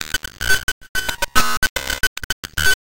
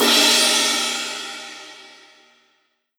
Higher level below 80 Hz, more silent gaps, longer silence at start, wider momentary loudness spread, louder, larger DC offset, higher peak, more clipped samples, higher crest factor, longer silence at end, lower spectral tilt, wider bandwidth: first, -32 dBFS vs -80 dBFS; first, 0.63-0.81 s, 0.89-0.95 s, 1.57-1.62 s, 1.70-1.76 s, 2.07-2.16 s, 2.24-2.43 s vs none; about the same, 0 s vs 0 s; second, 6 LU vs 23 LU; second, -20 LUFS vs -16 LUFS; neither; about the same, -2 dBFS vs -4 dBFS; neither; about the same, 18 dB vs 18 dB; second, 0.1 s vs 1.15 s; first, -1 dB/octave vs 1 dB/octave; second, 17.5 kHz vs over 20 kHz